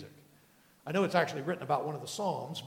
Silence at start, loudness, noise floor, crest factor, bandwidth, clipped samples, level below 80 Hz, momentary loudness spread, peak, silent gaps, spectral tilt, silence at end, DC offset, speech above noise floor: 0 s; -33 LUFS; -64 dBFS; 24 dB; 18.5 kHz; under 0.1%; -78 dBFS; 11 LU; -10 dBFS; none; -5 dB/octave; 0 s; under 0.1%; 31 dB